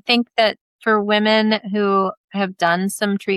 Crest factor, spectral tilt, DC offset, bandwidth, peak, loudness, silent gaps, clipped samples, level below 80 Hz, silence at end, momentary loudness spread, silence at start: 16 dB; -4.5 dB/octave; under 0.1%; 14 kHz; -2 dBFS; -18 LUFS; 0.61-0.79 s, 2.17-2.28 s; under 0.1%; -68 dBFS; 0 s; 8 LU; 0.05 s